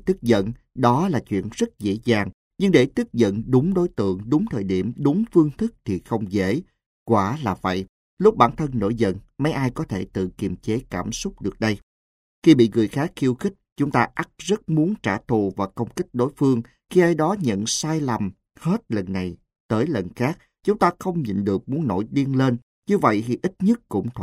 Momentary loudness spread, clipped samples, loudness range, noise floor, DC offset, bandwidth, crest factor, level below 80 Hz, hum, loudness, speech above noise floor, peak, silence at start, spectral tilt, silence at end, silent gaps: 9 LU; under 0.1%; 3 LU; under -90 dBFS; under 0.1%; 14.5 kHz; 22 dB; -50 dBFS; none; -22 LUFS; over 69 dB; 0 dBFS; 0.05 s; -6.5 dB/octave; 0 s; 2.34-2.51 s, 6.86-7.06 s, 7.89-8.17 s, 11.83-12.42 s, 13.72-13.76 s, 19.60-19.69 s, 22.63-22.82 s